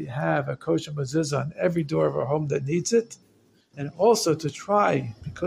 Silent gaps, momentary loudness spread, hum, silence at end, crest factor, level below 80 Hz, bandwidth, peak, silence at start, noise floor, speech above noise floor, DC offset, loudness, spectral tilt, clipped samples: none; 7 LU; none; 0 s; 18 dB; -58 dBFS; 15.5 kHz; -8 dBFS; 0 s; -58 dBFS; 34 dB; under 0.1%; -25 LUFS; -5.5 dB/octave; under 0.1%